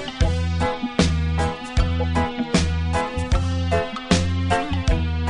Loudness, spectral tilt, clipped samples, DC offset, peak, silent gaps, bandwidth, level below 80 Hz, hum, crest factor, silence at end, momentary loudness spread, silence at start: -22 LUFS; -5.5 dB/octave; under 0.1%; under 0.1%; -2 dBFS; none; 10.5 kHz; -26 dBFS; none; 20 dB; 0 s; 3 LU; 0 s